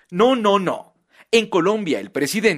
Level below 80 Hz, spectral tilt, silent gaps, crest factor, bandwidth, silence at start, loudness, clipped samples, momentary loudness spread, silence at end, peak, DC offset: -60 dBFS; -4.5 dB/octave; none; 16 dB; 15.5 kHz; 0.1 s; -19 LUFS; under 0.1%; 8 LU; 0 s; -4 dBFS; under 0.1%